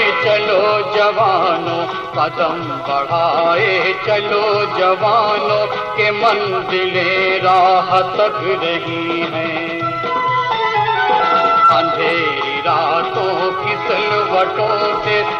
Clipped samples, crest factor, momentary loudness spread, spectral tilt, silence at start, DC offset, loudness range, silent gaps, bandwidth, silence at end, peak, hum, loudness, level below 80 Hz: under 0.1%; 12 dB; 6 LU; -5.5 dB/octave; 0 s; under 0.1%; 2 LU; none; 8 kHz; 0 s; -4 dBFS; none; -15 LUFS; -54 dBFS